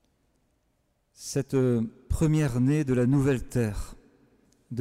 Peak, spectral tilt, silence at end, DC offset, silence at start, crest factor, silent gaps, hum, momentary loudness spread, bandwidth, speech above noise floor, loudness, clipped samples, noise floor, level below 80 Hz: -16 dBFS; -7.5 dB/octave; 0 s; under 0.1%; 1.2 s; 12 dB; none; none; 15 LU; 15 kHz; 47 dB; -26 LUFS; under 0.1%; -72 dBFS; -42 dBFS